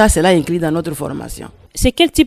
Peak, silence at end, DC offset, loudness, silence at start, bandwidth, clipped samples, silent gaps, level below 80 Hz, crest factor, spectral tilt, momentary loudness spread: 0 dBFS; 0 s; under 0.1%; -16 LUFS; 0 s; 16 kHz; under 0.1%; none; -26 dBFS; 14 dB; -4.5 dB/octave; 17 LU